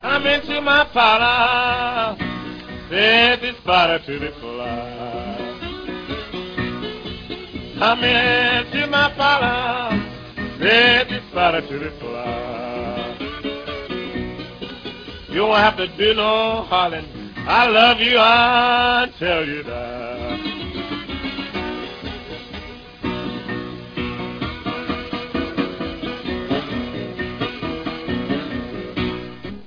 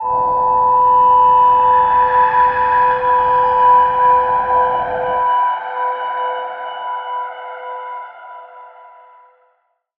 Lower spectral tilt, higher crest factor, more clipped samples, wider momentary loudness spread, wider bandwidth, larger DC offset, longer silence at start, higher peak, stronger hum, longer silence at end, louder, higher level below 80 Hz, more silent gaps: about the same, -5.5 dB/octave vs -6.5 dB/octave; first, 20 dB vs 12 dB; neither; about the same, 17 LU vs 17 LU; first, 5.2 kHz vs 4.2 kHz; neither; about the same, 0 s vs 0 s; about the same, 0 dBFS vs -2 dBFS; neither; second, 0 s vs 1.3 s; second, -19 LUFS vs -13 LUFS; first, -42 dBFS vs -48 dBFS; neither